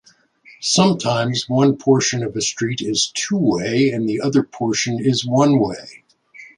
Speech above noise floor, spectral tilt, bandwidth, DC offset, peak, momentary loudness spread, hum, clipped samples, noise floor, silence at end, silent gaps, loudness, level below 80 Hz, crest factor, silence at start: 32 dB; -4.5 dB/octave; 11.5 kHz; under 0.1%; -2 dBFS; 6 LU; none; under 0.1%; -50 dBFS; 0.1 s; none; -18 LUFS; -56 dBFS; 18 dB; 0.6 s